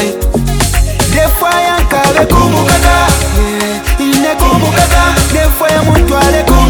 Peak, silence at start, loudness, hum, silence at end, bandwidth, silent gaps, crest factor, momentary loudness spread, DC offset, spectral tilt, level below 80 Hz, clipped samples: 0 dBFS; 0 s; -9 LUFS; none; 0 s; over 20 kHz; none; 8 dB; 5 LU; under 0.1%; -4.5 dB/octave; -14 dBFS; 1%